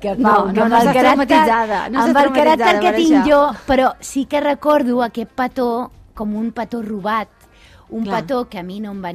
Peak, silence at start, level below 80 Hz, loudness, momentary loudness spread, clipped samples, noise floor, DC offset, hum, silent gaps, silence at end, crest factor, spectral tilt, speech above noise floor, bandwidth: -2 dBFS; 0 s; -44 dBFS; -15 LUFS; 13 LU; under 0.1%; -46 dBFS; under 0.1%; none; none; 0 s; 14 dB; -5 dB/octave; 31 dB; 15 kHz